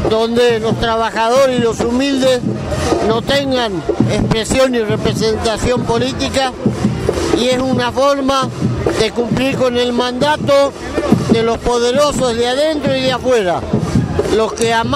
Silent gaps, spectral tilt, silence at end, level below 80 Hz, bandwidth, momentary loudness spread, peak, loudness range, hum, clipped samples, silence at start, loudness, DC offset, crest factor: none; -5 dB/octave; 0 s; -32 dBFS; 15.5 kHz; 4 LU; 0 dBFS; 1 LU; none; under 0.1%; 0 s; -14 LUFS; under 0.1%; 14 dB